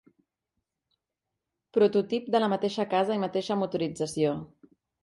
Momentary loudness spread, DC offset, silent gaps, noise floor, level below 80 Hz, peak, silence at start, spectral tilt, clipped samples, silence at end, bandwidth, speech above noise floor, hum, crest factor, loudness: 7 LU; under 0.1%; none; -86 dBFS; -70 dBFS; -12 dBFS; 1.75 s; -6 dB/octave; under 0.1%; 0.6 s; 11.5 kHz; 60 dB; none; 18 dB; -28 LUFS